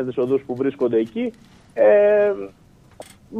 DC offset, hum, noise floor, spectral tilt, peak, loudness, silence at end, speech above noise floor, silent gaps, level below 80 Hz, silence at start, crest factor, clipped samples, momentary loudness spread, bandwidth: under 0.1%; none; -44 dBFS; -7.5 dB/octave; -4 dBFS; -19 LUFS; 0 s; 25 dB; none; -60 dBFS; 0 s; 16 dB; under 0.1%; 15 LU; 10 kHz